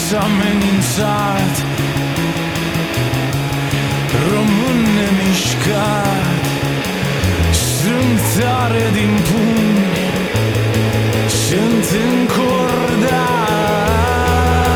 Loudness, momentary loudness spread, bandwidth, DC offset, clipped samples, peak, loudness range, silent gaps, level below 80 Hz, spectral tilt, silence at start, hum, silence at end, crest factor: -15 LUFS; 4 LU; 19.5 kHz; under 0.1%; under 0.1%; -2 dBFS; 2 LU; none; -30 dBFS; -5 dB/octave; 0 s; none; 0 s; 12 dB